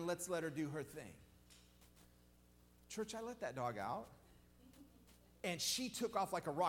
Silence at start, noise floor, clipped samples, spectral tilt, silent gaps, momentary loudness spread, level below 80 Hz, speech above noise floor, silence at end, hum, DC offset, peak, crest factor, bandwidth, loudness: 0 s; -68 dBFS; under 0.1%; -3.5 dB/octave; none; 25 LU; -72 dBFS; 25 dB; 0 s; 60 Hz at -65 dBFS; under 0.1%; -26 dBFS; 20 dB; 17.5 kHz; -43 LUFS